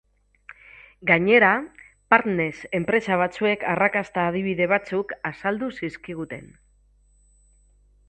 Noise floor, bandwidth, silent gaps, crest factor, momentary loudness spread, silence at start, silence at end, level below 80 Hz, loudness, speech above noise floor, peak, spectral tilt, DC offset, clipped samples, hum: -59 dBFS; 8.8 kHz; none; 24 dB; 16 LU; 1 s; 1.65 s; -58 dBFS; -22 LUFS; 37 dB; 0 dBFS; -6.5 dB/octave; under 0.1%; under 0.1%; 50 Hz at -50 dBFS